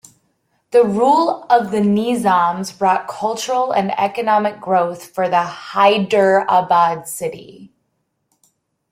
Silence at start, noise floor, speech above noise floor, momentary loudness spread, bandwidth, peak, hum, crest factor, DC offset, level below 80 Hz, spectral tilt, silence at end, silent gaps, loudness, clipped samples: 0.75 s; -70 dBFS; 54 dB; 9 LU; 16.5 kHz; -2 dBFS; none; 16 dB; under 0.1%; -62 dBFS; -5 dB/octave; 1.25 s; none; -16 LUFS; under 0.1%